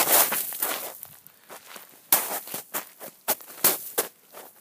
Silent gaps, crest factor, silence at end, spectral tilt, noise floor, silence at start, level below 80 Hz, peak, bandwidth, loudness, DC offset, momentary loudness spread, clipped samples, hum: none; 28 dB; 0.1 s; 0 dB/octave; -48 dBFS; 0 s; -80 dBFS; 0 dBFS; 16 kHz; -25 LUFS; under 0.1%; 23 LU; under 0.1%; none